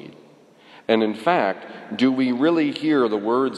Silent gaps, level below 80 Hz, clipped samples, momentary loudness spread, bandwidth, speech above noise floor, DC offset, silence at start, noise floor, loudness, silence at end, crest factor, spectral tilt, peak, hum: none; -78 dBFS; under 0.1%; 9 LU; 11 kHz; 30 dB; under 0.1%; 0 s; -50 dBFS; -21 LUFS; 0 s; 18 dB; -6.5 dB/octave; -4 dBFS; none